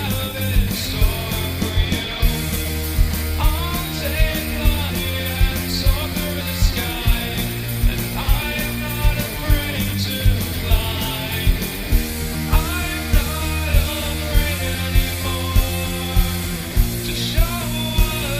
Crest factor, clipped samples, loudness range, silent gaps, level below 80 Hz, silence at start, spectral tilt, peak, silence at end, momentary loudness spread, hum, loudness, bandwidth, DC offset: 16 dB; under 0.1%; 1 LU; none; -22 dBFS; 0 s; -4.5 dB/octave; -2 dBFS; 0 s; 3 LU; none; -21 LUFS; 15.5 kHz; under 0.1%